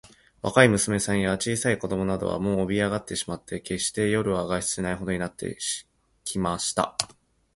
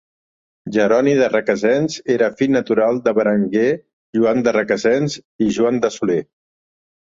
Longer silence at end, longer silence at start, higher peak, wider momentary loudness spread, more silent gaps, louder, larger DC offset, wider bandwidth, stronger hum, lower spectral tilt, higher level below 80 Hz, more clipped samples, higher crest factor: second, 0.5 s vs 0.9 s; second, 0.45 s vs 0.65 s; about the same, -2 dBFS vs -2 dBFS; first, 11 LU vs 7 LU; second, none vs 3.93-4.13 s, 5.25-5.39 s; second, -26 LUFS vs -17 LUFS; neither; first, 11.5 kHz vs 7.8 kHz; neither; second, -4 dB/octave vs -6 dB/octave; first, -50 dBFS vs -58 dBFS; neither; first, 24 dB vs 16 dB